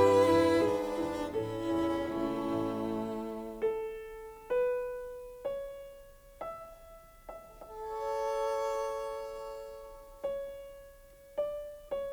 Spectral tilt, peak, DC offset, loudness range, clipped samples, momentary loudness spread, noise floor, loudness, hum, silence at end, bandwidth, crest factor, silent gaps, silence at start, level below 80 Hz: -6 dB/octave; -14 dBFS; under 0.1%; 8 LU; under 0.1%; 19 LU; -55 dBFS; -34 LUFS; none; 0 s; over 20 kHz; 20 dB; none; 0 s; -58 dBFS